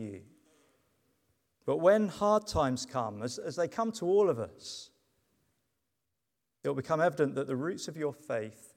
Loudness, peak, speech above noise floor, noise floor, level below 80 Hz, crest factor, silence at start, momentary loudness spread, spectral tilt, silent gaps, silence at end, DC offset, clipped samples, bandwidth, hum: -31 LUFS; -12 dBFS; 55 dB; -86 dBFS; -60 dBFS; 20 dB; 0 s; 14 LU; -5.5 dB/octave; none; 0.1 s; under 0.1%; under 0.1%; 15 kHz; none